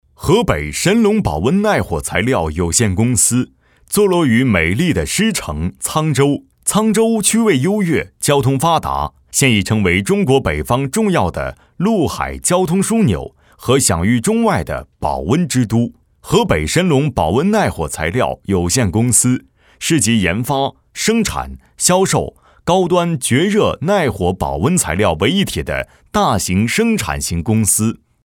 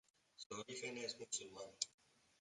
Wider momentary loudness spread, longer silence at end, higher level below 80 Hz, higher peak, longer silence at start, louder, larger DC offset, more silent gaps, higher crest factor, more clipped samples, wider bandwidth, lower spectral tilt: about the same, 7 LU vs 7 LU; second, 0.3 s vs 0.5 s; first, -34 dBFS vs -88 dBFS; first, 0 dBFS vs -20 dBFS; second, 0.2 s vs 0.4 s; first, -15 LUFS vs -47 LUFS; neither; second, none vs 0.46-0.50 s; second, 16 dB vs 32 dB; neither; first, 18 kHz vs 11.5 kHz; first, -4.5 dB/octave vs -1 dB/octave